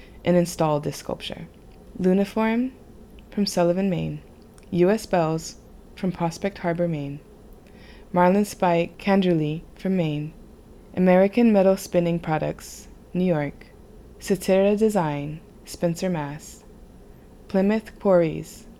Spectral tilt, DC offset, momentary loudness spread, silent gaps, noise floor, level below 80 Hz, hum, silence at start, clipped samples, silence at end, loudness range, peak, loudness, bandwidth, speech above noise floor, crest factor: -6.5 dB/octave; under 0.1%; 16 LU; none; -47 dBFS; -50 dBFS; none; 0.1 s; under 0.1%; 0.1 s; 4 LU; -4 dBFS; -23 LUFS; 14.5 kHz; 24 dB; 20 dB